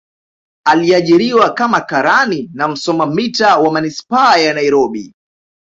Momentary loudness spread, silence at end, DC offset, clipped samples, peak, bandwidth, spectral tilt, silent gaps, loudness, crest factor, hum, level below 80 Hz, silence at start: 8 LU; 0.6 s; under 0.1%; under 0.1%; 0 dBFS; 7.8 kHz; -4.5 dB/octave; none; -12 LUFS; 14 dB; none; -56 dBFS; 0.65 s